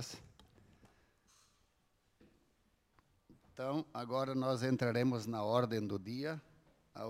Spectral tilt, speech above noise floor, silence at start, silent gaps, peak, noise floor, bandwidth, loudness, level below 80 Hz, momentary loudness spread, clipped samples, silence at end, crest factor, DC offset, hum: -6.5 dB/octave; 40 dB; 0 s; none; -18 dBFS; -76 dBFS; 16 kHz; -38 LUFS; -76 dBFS; 14 LU; under 0.1%; 0 s; 22 dB; under 0.1%; none